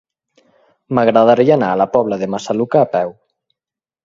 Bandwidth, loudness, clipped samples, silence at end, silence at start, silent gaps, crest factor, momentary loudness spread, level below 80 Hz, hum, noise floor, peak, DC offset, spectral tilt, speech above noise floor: 7.6 kHz; -15 LUFS; under 0.1%; 0.95 s; 0.9 s; none; 16 dB; 10 LU; -58 dBFS; none; -88 dBFS; 0 dBFS; under 0.1%; -7 dB/octave; 75 dB